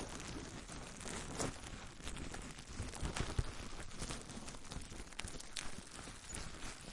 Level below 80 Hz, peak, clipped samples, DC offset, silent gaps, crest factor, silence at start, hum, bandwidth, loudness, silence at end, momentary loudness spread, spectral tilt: -52 dBFS; -20 dBFS; under 0.1%; under 0.1%; none; 26 dB; 0 s; none; 11.5 kHz; -47 LUFS; 0 s; 7 LU; -3.5 dB/octave